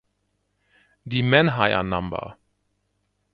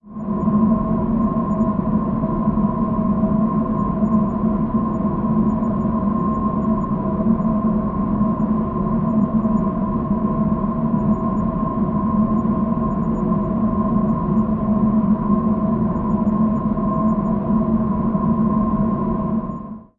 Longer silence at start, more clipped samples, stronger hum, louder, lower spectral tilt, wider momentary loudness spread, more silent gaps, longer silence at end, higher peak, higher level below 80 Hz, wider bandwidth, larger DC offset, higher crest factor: first, 1.05 s vs 0.05 s; neither; first, 50 Hz at -55 dBFS vs none; about the same, -21 LUFS vs -19 LUFS; second, -9 dB/octave vs -12.5 dB/octave; first, 15 LU vs 3 LU; neither; first, 1 s vs 0.15 s; first, -2 dBFS vs -6 dBFS; second, -50 dBFS vs -34 dBFS; first, 5.2 kHz vs 2.8 kHz; neither; first, 24 dB vs 12 dB